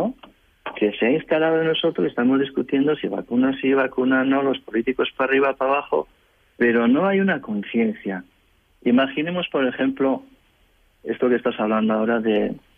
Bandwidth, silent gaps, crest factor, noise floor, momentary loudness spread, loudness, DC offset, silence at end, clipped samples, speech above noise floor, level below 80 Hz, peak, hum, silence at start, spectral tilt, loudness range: 3.7 kHz; none; 14 dB; -60 dBFS; 7 LU; -21 LUFS; under 0.1%; 0.2 s; under 0.1%; 40 dB; -60 dBFS; -8 dBFS; none; 0 s; -8.5 dB/octave; 3 LU